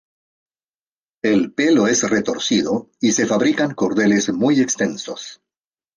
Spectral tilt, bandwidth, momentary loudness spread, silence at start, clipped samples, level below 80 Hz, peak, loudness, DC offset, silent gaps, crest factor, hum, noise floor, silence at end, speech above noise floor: -4 dB/octave; 10.5 kHz; 8 LU; 1.25 s; under 0.1%; -60 dBFS; -4 dBFS; -18 LUFS; under 0.1%; none; 14 dB; none; under -90 dBFS; 0.6 s; over 72 dB